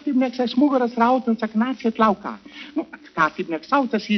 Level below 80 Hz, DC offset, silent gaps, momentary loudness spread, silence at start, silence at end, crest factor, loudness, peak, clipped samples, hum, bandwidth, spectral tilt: -62 dBFS; under 0.1%; none; 11 LU; 0.05 s; 0 s; 18 dB; -21 LUFS; -4 dBFS; under 0.1%; none; 6.4 kHz; -4 dB/octave